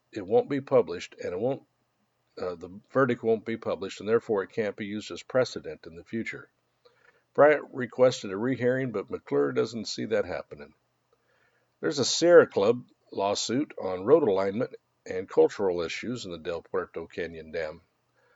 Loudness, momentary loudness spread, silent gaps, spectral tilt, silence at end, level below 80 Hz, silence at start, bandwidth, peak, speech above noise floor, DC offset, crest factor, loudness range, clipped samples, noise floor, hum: -27 LUFS; 15 LU; none; -4.5 dB/octave; 0.6 s; -68 dBFS; 0.15 s; 8 kHz; -4 dBFS; 47 dB; under 0.1%; 24 dB; 7 LU; under 0.1%; -74 dBFS; none